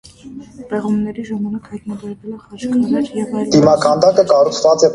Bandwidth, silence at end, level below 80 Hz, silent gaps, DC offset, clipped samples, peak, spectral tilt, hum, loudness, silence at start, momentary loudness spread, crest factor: 11 kHz; 0 s; -50 dBFS; none; under 0.1%; under 0.1%; 0 dBFS; -5.5 dB/octave; none; -15 LUFS; 0.25 s; 19 LU; 16 dB